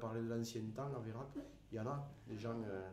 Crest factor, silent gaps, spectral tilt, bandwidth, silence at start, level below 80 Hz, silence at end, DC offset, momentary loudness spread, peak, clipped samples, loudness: 14 dB; none; -6.5 dB/octave; 15.5 kHz; 0 s; -68 dBFS; 0 s; under 0.1%; 8 LU; -30 dBFS; under 0.1%; -46 LUFS